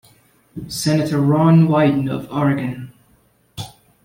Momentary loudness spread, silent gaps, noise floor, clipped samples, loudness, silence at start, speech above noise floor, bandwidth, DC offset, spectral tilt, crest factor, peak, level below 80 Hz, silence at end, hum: 23 LU; none; -57 dBFS; under 0.1%; -17 LUFS; 0.55 s; 41 dB; 16 kHz; under 0.1%; -7 dB/octave; 16 dB; -4 dBFS; -52 dBFS; 0.35 s; none